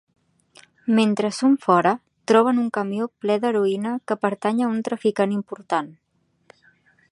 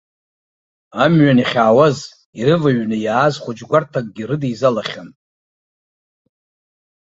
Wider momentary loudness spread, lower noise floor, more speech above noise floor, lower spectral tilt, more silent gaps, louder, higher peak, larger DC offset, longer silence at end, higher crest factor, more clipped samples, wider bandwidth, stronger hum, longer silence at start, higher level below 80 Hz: second, 9 LU vs 15 LU; second, -59 dBFS vs under -90 dBFS; second, 38 dB vs over 75 dB; about the same, -6 dB/octave vs -7 dB/octave; second, none vs 2.25-2.33 s; second, -22 LUFS vs -16 LUFS; about the same, -2 dBFS vs -2 dBFS; neither; second, 1.2 s vs 1.9 s; about the same, 20 dB vs 16 dB; neither; first, 11.5 kHz vs 8 kHz; neither; about the same, 0.85 s vs 0.95 s; second, -74 dBFS vs -58 dBFS